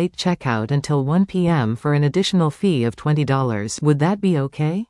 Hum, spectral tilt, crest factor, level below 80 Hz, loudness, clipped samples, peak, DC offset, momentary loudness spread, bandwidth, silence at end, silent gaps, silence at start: none; -6.5 dB/octave; 14 dB; -52 dBFS; -19 LUFS; under 0.1%; -4 dBFS; under 0.1%; 3 LU; 11.5 kHz; 0.05 s; none; 0 s